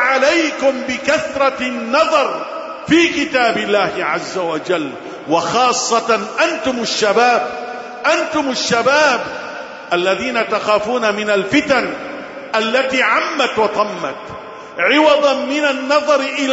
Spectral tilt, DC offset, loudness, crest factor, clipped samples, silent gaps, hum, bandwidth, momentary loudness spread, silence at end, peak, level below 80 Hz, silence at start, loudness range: -3 dB/octave; under 0.1%; -15 LUFS; 14 dB; under 0.1%; none; none; 8 kHz; 13 LU; 0 s; -2 dBFS; -54 dBFS; 0 s; 2 LU